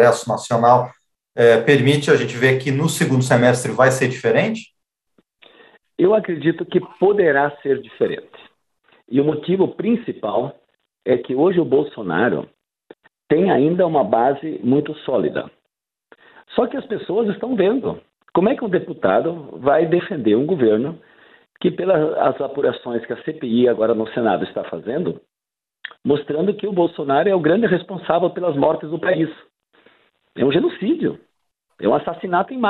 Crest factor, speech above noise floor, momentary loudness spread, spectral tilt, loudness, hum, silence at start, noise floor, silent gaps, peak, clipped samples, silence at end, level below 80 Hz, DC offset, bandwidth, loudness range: 18 dB; 70 dB; 11 LU; -6 dB/octave; -19 LUFS; none; 0 s; -88 dBFS; none; -2 dBFS; under 0.1%; 0 s; -60 dBFS; under 0.1%; 12.5 kHz; 6 LU